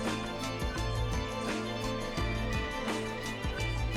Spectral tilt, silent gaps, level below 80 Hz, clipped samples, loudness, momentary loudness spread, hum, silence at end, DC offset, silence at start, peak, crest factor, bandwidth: -5 dB/octave; none; -40 dBFS; under 0.1%; -34 LUFS; 2 LU; none; 0 s; under 0.1%; 0 s; -22 dBFS; 12 dB; 15.5 kHz